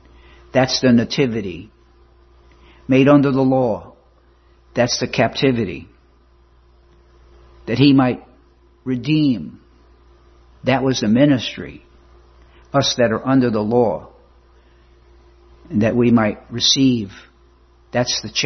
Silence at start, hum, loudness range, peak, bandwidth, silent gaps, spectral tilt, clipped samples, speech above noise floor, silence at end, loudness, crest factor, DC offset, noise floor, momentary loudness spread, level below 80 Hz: 0.55 s; none; 4 LU; -2 dBFS; 6.4 kHz; none; -5 dB/octave; under 0.1%; 36 dB; 0 s; -17 LUFS; 18 dB; under 0.1%; -53 dBFS; 16 LU; -48 dBFS